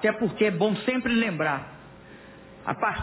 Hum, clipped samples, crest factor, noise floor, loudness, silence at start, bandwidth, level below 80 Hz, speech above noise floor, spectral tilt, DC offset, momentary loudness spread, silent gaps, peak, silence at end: none; under 0.1%; 16 dB; -47 dBFS; -26 LUFS; 0 s; 4 kHz; -56 dBFS; 22 dB; -10 dB/octave; under 0.1%; 22 LU; none; -10 dBFS; 0 s